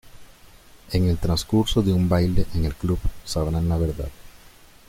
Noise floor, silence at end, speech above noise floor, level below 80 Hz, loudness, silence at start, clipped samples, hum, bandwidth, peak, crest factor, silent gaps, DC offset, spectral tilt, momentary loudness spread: -49 dBFS; 0.4 s; 27 dB; -32 dBFS; -23 LUFS; 0.05 s; under 0.1%; none; 16 kHz; -6 dBFS; 18 dB; none; under 0.1%; -6.5 dB/octave; 8 LU